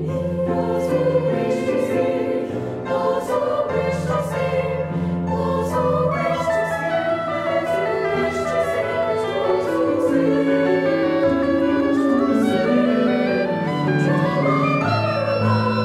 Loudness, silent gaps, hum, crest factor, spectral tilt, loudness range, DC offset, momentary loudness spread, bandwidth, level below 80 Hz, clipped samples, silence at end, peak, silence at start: -20 LUFS; none; none; 14 dB; -7 dB/octave; 3 LU; under 0.1%; 4 LU; 14.5 kHz; -50 dBFS; under 0.1%; 0 s; -6 dBFS; 0 s